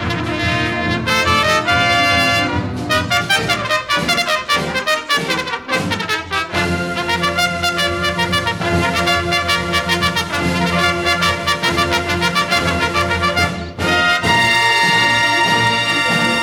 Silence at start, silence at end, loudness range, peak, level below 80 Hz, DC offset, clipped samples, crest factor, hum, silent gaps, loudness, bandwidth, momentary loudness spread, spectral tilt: 0 s; 0 s; 4 LU; -2 dBFS; -38 dBFS; under 0.1%; under 0.1%; 14 dB; none; none; -15 LUFS; 19 kHz; 6 LU; -3.5 dB/octave